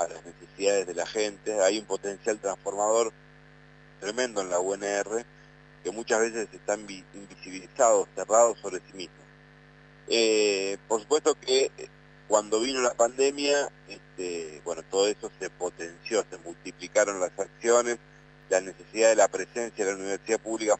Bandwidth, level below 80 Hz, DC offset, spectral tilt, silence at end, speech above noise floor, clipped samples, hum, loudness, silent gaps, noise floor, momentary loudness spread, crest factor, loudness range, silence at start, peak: 9.2 kHz; -64 dBFS; under 0.1%; -2 dB/octave; 0 s; 26 dB; under 0.1%; 50 Hz at -55 dBFS; -27 LUFS; none; -53 dBFS; 17 LU; 20 dB; 4 LU; 0 s; -8 dBFS